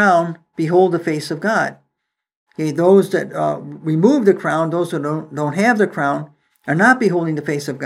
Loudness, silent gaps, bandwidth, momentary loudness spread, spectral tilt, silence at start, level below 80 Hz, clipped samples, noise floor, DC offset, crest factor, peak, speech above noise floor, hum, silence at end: -17 LUFS; 2.36-2.46 s; 13 kHz; 11 LU; -6.5 dB/octave; 0 s; -72 dBFS; under 0.1%; -78 dBFS; under 0.1%; 18 dB; 0 dBFS; 62 dB; none; 0 s